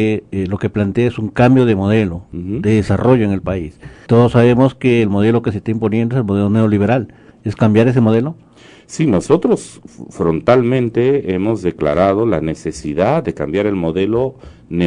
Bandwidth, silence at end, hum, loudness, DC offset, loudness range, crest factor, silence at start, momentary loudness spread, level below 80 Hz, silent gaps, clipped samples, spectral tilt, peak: 10.5 kHz; 0 s; none; -15 LUFS; under 0.1%; 2 LU; 14 dB; 0 s; 11 LU; -44 dBFS; none; under 0.1%; -8 dB/octave; 0 dBFS